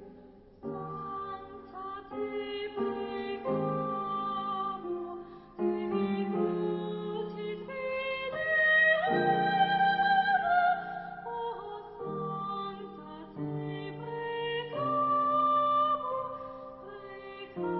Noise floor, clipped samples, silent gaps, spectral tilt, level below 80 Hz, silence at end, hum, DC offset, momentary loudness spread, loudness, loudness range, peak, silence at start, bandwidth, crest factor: -54 dBFS; under 0.1%; none; -9 dB/octave; -66 dBFS; 0 s; none; under 0.1%; 17 LU; -31 LUFS; 11 LU; -14 dBFS; 0 s; 5.6 kHz; 16 dB